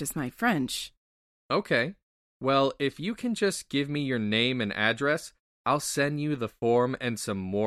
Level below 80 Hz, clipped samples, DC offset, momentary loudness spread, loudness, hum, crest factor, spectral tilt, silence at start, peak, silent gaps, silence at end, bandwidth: -62 dBFS; under 0.1%; under 0.1%; 7 LU; -28 LUFS; none; 20 dB; -4.5 dB/octave; 0 s; -8 dBFS; 0.97-1.49 s, 2.03-2.40 s, 5.39-5.65 s; 0 s; 15 kHz